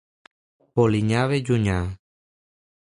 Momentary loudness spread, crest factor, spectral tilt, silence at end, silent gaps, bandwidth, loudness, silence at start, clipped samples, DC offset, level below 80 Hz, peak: 10 LU; 18 dB; -7 dB/octave; 1 s; none; 11 kHz; -22 LUFS; 0.75 s; under 0.1%; under 0.1%; -42 dBFS; -6 dBFS